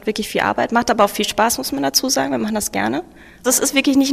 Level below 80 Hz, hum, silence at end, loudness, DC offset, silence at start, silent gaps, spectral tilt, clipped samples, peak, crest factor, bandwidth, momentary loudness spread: -48 dBFS; none; 0 s; -18 LUFS; under 0.1%; 0.05 s; none; -2.5 dB/octave; under 0.1%; -2 dBFS; 18 dB; 16 kHz; 6 LU